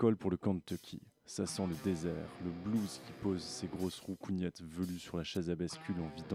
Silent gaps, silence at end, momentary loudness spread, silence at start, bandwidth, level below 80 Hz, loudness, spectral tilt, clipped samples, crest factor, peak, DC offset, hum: none; 0 s; 7 LU; 0 s; 16 kHz; -62 dBFS; -39 LUFS; -6 dB/octave; under 0.1%; 20 dB; -18 dBFS; under 0.1%; none